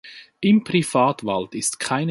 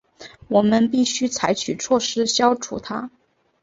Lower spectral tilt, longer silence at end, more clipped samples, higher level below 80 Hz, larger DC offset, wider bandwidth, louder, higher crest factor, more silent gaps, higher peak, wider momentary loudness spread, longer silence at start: about the same, -4.5 dB/octave vs -3.5 dB/octave; second, 0 s vs 0.55 s; neither; about the same, -60 dBFS vs -56 dBFS; neither; first, 11.5 kHz vs 8 kHz; about the same, -21 LUFS vs -20 LUFS; about the same, 16 dB vs 18 dB; neither; second, -6 dBFS vs -2 dBFS; second, 7 LU vs 11 LU; second, 0.05 s vs 0.2 s